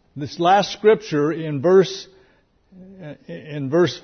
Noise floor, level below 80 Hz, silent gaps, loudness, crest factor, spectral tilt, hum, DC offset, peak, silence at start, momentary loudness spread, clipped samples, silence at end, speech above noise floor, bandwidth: -58 dBFS; -62 dBFS; none; -19 LUFS; 16 dB; -6 dB/octave; none; under 0.1%; -4 dBFS; 0.15 s; 21 LU; under 0.1%; 0.05 s; 39 dB; 6.6 kHz